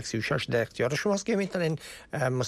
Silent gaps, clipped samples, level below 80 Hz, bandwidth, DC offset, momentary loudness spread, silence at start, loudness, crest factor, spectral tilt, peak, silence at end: none; under 0.1%; -60 dBFS; 14 kHz; under 0.1%; 4 LU; 0 s; -29 LUFS; 14 dB; -5 dB/octave; -16 dBFS; 0 s